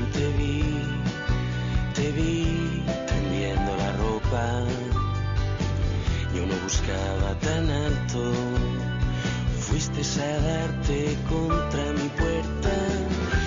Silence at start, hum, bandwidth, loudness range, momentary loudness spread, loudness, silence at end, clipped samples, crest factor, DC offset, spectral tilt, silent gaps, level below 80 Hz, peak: 0 s; none; 7.6 kHz; 1 LU; 2 LU; -26 LUFS; 0 s; under 0.1%; 14 dB; under 0.1%; -5.5 dB/octave; none; -32 dBFS; -12 dBFS